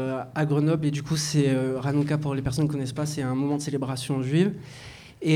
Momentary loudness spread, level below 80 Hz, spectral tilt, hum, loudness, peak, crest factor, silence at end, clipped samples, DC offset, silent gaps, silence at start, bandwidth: 7 LU; -52 dBFS; -6 dB/octave; none; -26 LUFS; -10 dBFS; 16 dB; 0 s; under 0.1%; under 0.1%; none; 0 s; 14.5 kHz